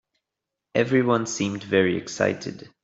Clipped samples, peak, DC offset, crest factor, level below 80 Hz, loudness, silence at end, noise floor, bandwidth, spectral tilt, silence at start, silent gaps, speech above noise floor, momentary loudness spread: under 0.1%; -6 dBFS; under 0.1%; 20 dB; -64 dBFS; -24 LUFS; 0.2 s; -85 dBFS; 8 kHz; -5 dB/octave; 0.75 s; none; 62 dB; 7 LU